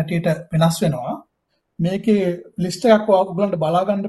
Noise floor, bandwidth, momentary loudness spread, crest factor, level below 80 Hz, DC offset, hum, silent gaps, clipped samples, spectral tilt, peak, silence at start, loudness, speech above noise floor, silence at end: -71 dBFS; 12.5 kHz; 10 LU; 16 dB; -54 dBFS; under 0.1%; none; none; under 0.1%; -6.5 dB/octave; -2 dBFS; 0 s; -19 LUFS; 53 dB; 0 s